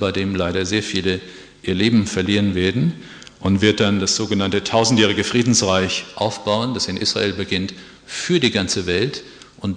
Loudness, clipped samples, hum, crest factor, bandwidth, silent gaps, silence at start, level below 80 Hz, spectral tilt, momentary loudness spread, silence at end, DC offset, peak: -19 LUFS; under 0.1%; none; 18 dB; 10.5 kHz; none; 0 s; -50 dBFS; -4 dB/octave; 11 LU; 0 s; under 0.1%; -2 dBFS